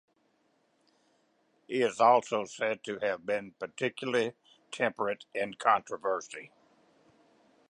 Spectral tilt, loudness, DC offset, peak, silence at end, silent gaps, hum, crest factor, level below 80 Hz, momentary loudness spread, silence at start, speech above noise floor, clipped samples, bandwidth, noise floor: -4 dB/octave; -30 LUFS; under 0.1%; -10 dBFS; 1.25 s; none; none; 24 dB; -80 dBFS; 12 LU; 1.7 s; 42 dB; under 0.1%; 11 kHz; -72 dBFS